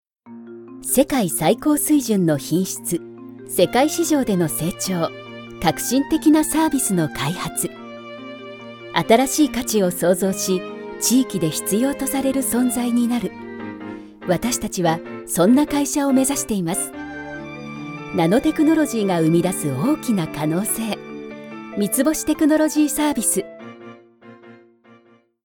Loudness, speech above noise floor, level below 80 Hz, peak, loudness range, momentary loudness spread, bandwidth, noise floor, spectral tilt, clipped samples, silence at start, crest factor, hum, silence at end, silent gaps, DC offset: -19 LUFS; 35 dB; -50 dBFS; 0 dBFS; 2 LU; 17 LU; 18 kHz; -54 dBFS; -4.5 dB/octave; under 0.1%; 0.25 s; 20 dB; none; 0.9 s; none; under 0.1%